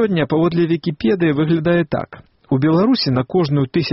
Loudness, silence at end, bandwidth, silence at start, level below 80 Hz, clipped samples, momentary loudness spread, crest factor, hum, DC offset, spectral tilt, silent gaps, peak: -17 LUFS; 0 s; 6 kHz; 0 s; -48 dBFS; under 0.1%; 6 LU; 12 dB; none; under 0.1%; -6 dB/octave; none; -6 dBFS